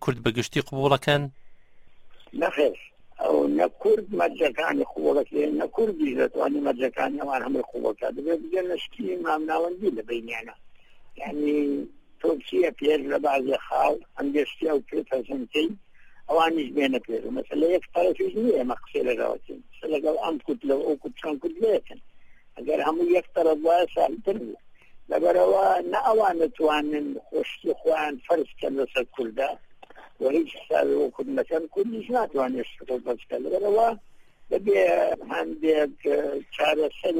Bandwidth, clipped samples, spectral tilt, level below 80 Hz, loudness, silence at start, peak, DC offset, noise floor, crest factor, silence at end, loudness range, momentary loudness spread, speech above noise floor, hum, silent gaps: 16 kHz; under 0.1%; -6 dB/octave; -58 dBFS; -25 LUFS; 0 s; -4 dBFS; under 0.1%; -48 dBFS; 20 dB; 0 s; 5 LU; 9 LU; 23 dB; none; none